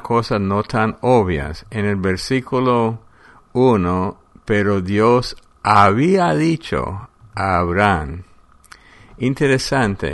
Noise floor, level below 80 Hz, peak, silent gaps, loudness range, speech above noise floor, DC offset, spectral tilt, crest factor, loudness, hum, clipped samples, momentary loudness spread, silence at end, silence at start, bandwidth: -47 dBFS; -40 dBFS; 0 dBFS; none; 4 LU; 31 dB; under 0.1%; -6.5 dB/octave; 18 dB; -17 LUFS; none; under 0.1%; 12 LU; 0 s; 0 s; 11.5 kHz